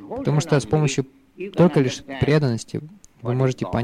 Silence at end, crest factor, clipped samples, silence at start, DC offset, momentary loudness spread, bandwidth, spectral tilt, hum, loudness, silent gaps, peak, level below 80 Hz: 0 s; 16 dB; under 0.1%; 0 s; under 0.1%; 15 LU; 11 kHz; -6.5 dB/octave; none; -21 LUFS; none; -6 dBFS; -48 dBFS